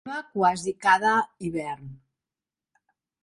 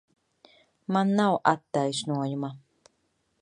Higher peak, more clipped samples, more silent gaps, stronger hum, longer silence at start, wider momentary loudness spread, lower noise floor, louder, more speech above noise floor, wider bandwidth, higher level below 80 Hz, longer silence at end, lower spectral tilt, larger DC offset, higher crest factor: about the same, -6 dBFS vs -6 dBFS; neither; neither; neither; second, 0.05 s vs 0.9 s; about the same, 13 LU vs 12 LU; first, under -90 dBFS vs -73 dBFS; first, -24 LUFS vs -27 LUFS; first, over 65 dB vs 48 dB; about the same, 11.5 kHz vs 11 kHz; first, -64 dBFS vs -74 dBFS; first, 1.25 s vs 0.85 s; about the same, -4.5 dB/octave vs -5.5 dB/octave; neither; about the same, 20 dB vs 24 dB